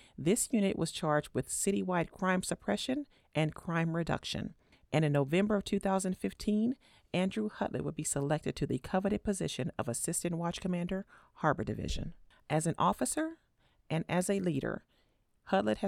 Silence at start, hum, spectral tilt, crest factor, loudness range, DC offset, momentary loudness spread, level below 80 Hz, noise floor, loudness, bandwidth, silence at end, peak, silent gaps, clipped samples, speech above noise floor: 0.2 s; none; -5 dB/octave; 20 dB; 2 LU; under 0.1%; 8 LU; -54 dBFS; -72 dBFS; -34 LUFS; 16 kHz; 0 s; -14 dBFS; none; under 0.1%; 39 dB